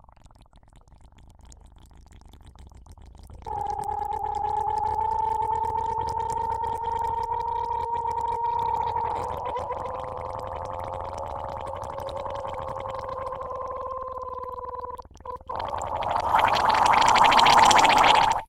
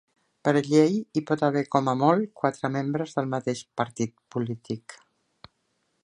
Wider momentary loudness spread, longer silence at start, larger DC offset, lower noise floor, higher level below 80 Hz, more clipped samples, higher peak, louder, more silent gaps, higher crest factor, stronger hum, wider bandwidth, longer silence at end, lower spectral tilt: first, 17 LU vs 11 LU; first, 1.5 s vs 0.45 s; neither; second, -53 dBFS vs -74 dBFS; first, -46 dBFS vs -70 dBFS; neither; first, -2 dBFS vs -6 dBFS; about the same, -25 LUFS vs -26 LUFS; neither; about the same, 24 dB vs 20 dB; neither; first, 16 kHz vs 11 kHz; second, 0.05 s vs 1.1 s; second, -2.5 dB/octave vs -6.5 dB/octave